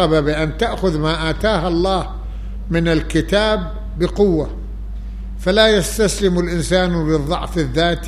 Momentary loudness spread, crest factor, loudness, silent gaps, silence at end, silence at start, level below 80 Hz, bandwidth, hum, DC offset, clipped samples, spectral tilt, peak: 15 LU; 18 dB; -17 LUFS; none; 0 s; 0 s; -26 dBFS; 14.5 kHz; none; under 0.1%; under 0.1%; -5 dB/octave; 0 dBFS